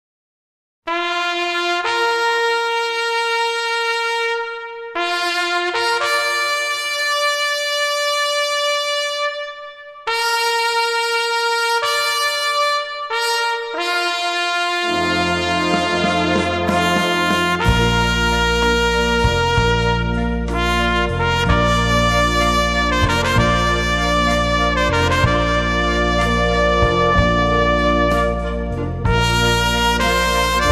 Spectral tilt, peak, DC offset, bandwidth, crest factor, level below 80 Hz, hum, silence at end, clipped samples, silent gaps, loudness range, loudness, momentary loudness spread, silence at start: -4 dB/octave; -2 dBFS; under 0.1%; 15.5 kHz; 16 dB; -28 dBFS; none; 0 s; under 0.1%; none; 3 LU; -17 LUFS; 5 LU; 0.85 s